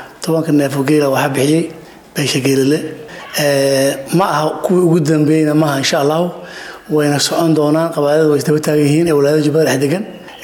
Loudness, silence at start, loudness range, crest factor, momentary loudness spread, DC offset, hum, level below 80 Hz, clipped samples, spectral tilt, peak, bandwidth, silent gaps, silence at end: -14 LUFS; 0 s; 2 LU; 10 dB; 9 LU; under 0.1%; none; -56 dBFS; under 0.1%; -5.5 dB/octave; -2 dBFS; 18 kHz; none; 0 s